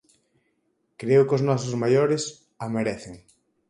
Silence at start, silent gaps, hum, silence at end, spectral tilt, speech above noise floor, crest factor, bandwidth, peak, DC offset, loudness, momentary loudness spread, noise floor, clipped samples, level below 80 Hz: 1 s; none; none; 0.5 s; -6 dB/octave; 49 dB; 18 dB; 11 kHz; -8 dBFS; under 0.1%; -23 LUFS; 16 LU; -72 dBFS; under 0.1%; -62 dBFS